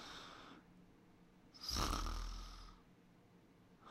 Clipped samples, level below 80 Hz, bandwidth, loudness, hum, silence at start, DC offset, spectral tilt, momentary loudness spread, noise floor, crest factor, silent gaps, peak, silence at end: under 0.1%; -52 dBFS; 16 kHz; -45 LUFS; none; 0 s; under 0.1%; -3 dB/octave; 27 LU; -67 dBFS; 26 dB; none; -24 dBFS; 0 s